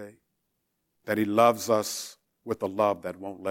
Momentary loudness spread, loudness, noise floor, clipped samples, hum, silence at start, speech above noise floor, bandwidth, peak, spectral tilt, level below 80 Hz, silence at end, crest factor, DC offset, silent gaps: 22 LU; -27 LUFS; -78 dBFS; under 0.1%; none; 0 s; 52 dB; 17 kHz; -8 dBFS; -4.5 dB/octave; -74 dBFS; 0 s; 20 dB; under 0.1%; none